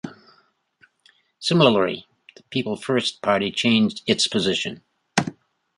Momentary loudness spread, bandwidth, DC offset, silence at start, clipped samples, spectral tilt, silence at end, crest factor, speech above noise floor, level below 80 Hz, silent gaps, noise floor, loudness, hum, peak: 12 LU; 11.5 kHz; under 0.1%; 0.05 s; under 0.1%; -4.5 dB/octave; 0.45 s; 22 dB; 41 dB; -60 dBFS; none; -62 dBFS; -21 LUFS; none; -2 dBFS